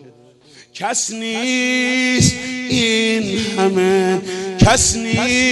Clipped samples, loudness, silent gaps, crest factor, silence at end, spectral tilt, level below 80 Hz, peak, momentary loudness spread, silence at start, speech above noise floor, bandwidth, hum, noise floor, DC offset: under 0.1%; -16 LUFS; none; 16 dB; 0 s; -3.5 dB/octave; -36 dBFS; 0 dBFS; 7 LU; 0.55 s; 30 dB; 12 kHz; none; -46 dBFS; under 0.1%